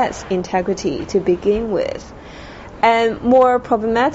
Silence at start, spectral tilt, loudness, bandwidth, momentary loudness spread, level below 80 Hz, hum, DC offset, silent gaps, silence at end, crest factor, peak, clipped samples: 0 s; -4 dB/octave; -17 LUFS; 8 kHz; 22 LU; -42 dBFS; none; under 0.1%; none; 0 s; 14 dB; -4 dBFS; under 0.1%